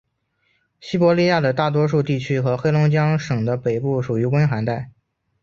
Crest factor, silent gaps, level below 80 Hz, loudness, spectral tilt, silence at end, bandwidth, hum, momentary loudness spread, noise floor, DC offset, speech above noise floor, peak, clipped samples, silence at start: 16 dB; none; -54 dBFS; -19 LUFS; -7.5 dB/octave; 0.55 s; 7.2 kHz; none; 8 LU; -68 dBFS; under 0.1%; 49 dB; -4 dBFS; under 0.1%; 0.85 s